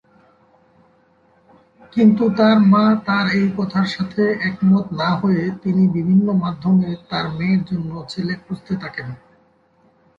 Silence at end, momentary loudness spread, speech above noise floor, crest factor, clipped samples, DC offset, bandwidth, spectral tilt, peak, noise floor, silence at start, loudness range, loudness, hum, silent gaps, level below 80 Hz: 1 s; 12 LU; 40 dB; 16 dB; under 0.1%; under 0.1%; 7.2 kHz; -8 dB/octave; -4 dBFS; -57 dBFS; 1.95 s; 6 LU; -18 LUFS; none; none; -54 dBFS